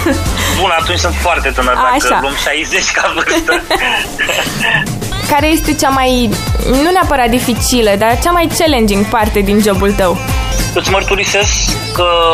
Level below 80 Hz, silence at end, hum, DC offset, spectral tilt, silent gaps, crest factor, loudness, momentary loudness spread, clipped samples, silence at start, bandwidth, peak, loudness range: -22 dBFS; 0 s; none; under 0.1%; -3.5 dB/octave; none; 12 dB; -11 LUFS; 3 LU; under 0.1%; 0 s; 15.5 kHz; 0 dBFS; 1 LU